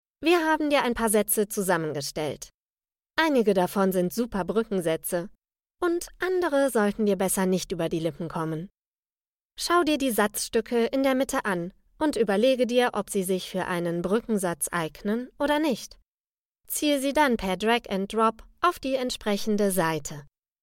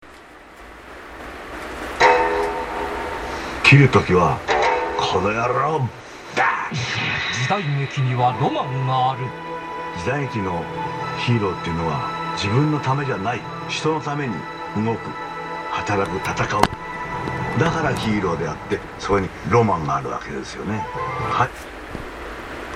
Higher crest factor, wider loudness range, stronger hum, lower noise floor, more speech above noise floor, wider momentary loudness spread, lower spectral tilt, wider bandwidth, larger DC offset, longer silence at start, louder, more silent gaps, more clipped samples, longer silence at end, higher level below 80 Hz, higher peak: about the same, 18 dB vs 22 dB; second, 2 LU vs 6 LU; neither; first, under -90 dBFS vs -43 dBFS; first, over 65 dB vs 22 dB; second, 9 LU vs 13 LU; about the same, -4.5 dB/octave vs -5.5 dB/octave; first, 17 kHz vs 13.5 kHz; neither; first, 0.2 s vs 0 s; second, -26 LUFS vs -21 LUFS; first, 2.54-2.76 s, 8.86-8.92 s, 8.98-9.03 s, 9.12-9.50 s, 16.08-16.24 s, 16.38-16.52 s vs none; neither; first, 0.35 s vs 0 s; second, -54 dBFS vs -44 dBFS; second, -8 dBFS vs 0 dBFS